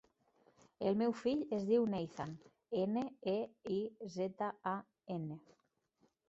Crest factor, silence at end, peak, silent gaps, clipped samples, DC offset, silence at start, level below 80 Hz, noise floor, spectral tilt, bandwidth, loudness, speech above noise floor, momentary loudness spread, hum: 18 dB; 0.9 s; -22 dBFS; none; under 0.1%; under 0.1%; 0.8 s; -76 dBFS; -77 dBFS; -6.5 dB/octave; 8 kHz; -39 LUFS; 39 dB; 12 LU; none